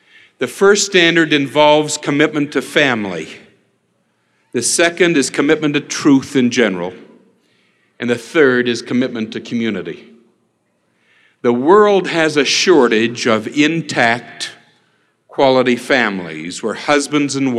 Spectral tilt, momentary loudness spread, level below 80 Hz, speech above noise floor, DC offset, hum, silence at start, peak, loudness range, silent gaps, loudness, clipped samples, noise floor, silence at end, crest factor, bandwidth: -3.5 dB/octave; 14 LU; -62 dBFS; 49 dB; under 0.1%; none; 0.4 s; 0 dBFS; 5 LU; none; -14 LUFS; under 0.1%; -63 dBFS; 0 s; 16 dB; 13.5 kHz